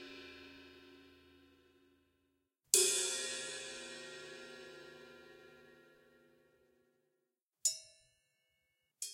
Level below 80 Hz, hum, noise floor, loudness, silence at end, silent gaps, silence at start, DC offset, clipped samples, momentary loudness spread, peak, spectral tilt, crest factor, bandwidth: -84 dBFS; none; -86 dBFS; -35 LUFS; 0 s; 7.43-7.47 s; 0 s; under 0.1%; under 0.1%; 28 LU; -10 dBFS; 1 dB/octave; 34 dB; 16 kHz